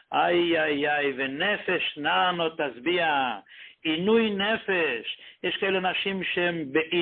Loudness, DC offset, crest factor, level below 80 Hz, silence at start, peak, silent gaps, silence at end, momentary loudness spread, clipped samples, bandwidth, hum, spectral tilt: -25 LUFS; under 0.1%; 16 dB; -66 dBFS; 0.1 s; -10 dBFS; none; 0 s; 7 LU; under 0.1%; 4.4 kHz; none; -9 dB/octave